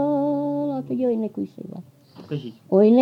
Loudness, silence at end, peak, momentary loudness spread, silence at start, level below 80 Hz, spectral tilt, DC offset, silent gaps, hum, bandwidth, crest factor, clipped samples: -24 LUFS; 0 s; -6 dBFS; 17 LU; 0 s; -78 dBFS; -10 dB/octave; under 0.1%; none; none; 5.6 kHz; 16 dB; under 0.1%